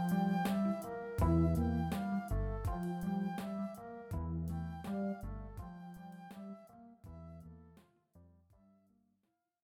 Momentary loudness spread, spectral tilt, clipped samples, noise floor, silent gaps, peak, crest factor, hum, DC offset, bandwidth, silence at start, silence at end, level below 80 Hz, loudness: 20 LU; -8 dB/octave; under 0.1%; -83 dBFS; none; -20 dBFS; 18 dB; none; under 0.1%; 18 kHz; 0 s; 1.35 s; -48 dBFS; -38 LUFS